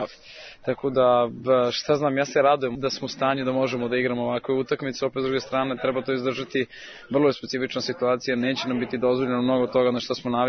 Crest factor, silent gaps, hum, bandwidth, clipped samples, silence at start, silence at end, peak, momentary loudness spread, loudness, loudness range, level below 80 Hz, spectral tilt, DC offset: 16 dB; none; none; 6.6 kHz; under 0.1%; 0 s; 0 s; -8 dBFS; 7 LU; -24 LUFS; 3 LU; -60 dBFS; -5.5 dB/octave; under 0.1%